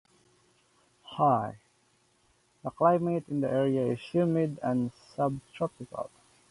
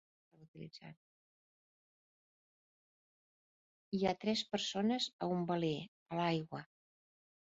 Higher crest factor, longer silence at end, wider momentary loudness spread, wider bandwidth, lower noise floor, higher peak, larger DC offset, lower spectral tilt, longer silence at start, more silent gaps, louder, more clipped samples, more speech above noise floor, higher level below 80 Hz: about the same, 20 dB vs 20 dB; second, 0.45 s vs 0.95 s; second, 14 LU vs 17 LU; first, 11.5 kHz vs 7.4 kHz; second, -68 dBFS vs under -90 dBFS; first, -10 dBFS vs -22 dBFS; neither; first, -8.5 dB/octave vs -4.5 dB/octave; first, 1.05 s vs 0.4 s; second, none vs 0.48-0.54 s, 0.97-3.92 s, 5.13-5.19 s, 5.88-6.06 s; first, -29 LUFS vs -38 LUFS; neither; second, 40 dB vs over 52 dB; first, -68 dBFS vs -76 dBFS